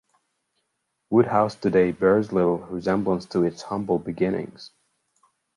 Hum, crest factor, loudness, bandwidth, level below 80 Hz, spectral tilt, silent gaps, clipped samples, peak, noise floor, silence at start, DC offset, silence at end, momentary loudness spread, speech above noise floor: none; 18 dB; -23 LUFS; 11 kHz; -56 dBFS; -7.5 dB/octave; none; under 0.1%; -6 dBFS; -77 dBFS; 1.1 s; under 0.1%; 0.9 s; 7 LU; 54 dB